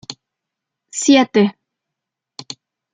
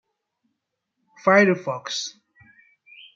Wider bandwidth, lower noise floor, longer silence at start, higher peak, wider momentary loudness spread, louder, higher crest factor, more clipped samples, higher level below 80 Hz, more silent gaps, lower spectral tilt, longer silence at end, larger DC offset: first, 9.4 kHz vs 7.6 kHz; about the same, -82 dBFS vs -79 dBFS; second, 0.1 s vs 1.25 s; about the same, -2 dBFS vs -2 dBFS; first, 23 LU vs 12 LU; first, -15 LUFS vs -21 LUFS; about the same, 18 dB vs 22 dB; neither; first, -64 dBFS vs -72 dBFS; neither; about the same, -4 dB/octave vs -4.5 dB/octave; second, 0.4 s vs 1.05 s; neither